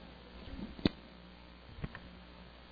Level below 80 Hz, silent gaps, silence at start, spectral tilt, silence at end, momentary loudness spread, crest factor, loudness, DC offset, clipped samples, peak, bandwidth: -54 dBFS; none; 0 s; -5 dB/octave; 0 s; 18 LU; 32 dB; -42 LUFS; under 0.1%; under 0.1%; -12 dBFS; 5 kHz